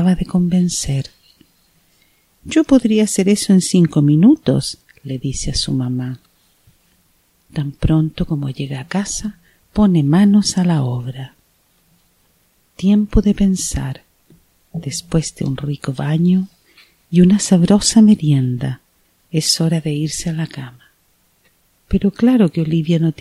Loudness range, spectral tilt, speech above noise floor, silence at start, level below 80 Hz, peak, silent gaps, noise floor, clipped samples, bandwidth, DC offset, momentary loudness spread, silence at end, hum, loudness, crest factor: 7 LU; -6 dB/octave; 44 dB; 0 s; -34 dBFS; 0 dBFS; none; -59 dBFS; under 0.1%; 13.5 kHz; under 0.1%; 15 LU; 0.1 s; none; -16 LUFS; 16 dB